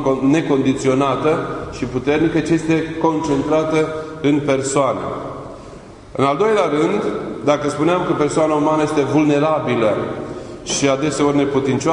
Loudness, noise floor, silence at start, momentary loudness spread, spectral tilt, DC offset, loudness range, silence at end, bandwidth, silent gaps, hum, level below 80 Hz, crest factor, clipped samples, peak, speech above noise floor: -17 LUFS; -37 dBFS; 0 s; 10 LU; -5.5 dB/octave; under 0.1%; 2 LU; 0 s; 11 kHz; none; none; -46 dBFS; 16 dB; under 0.1%; -2 dBFS; 20 dB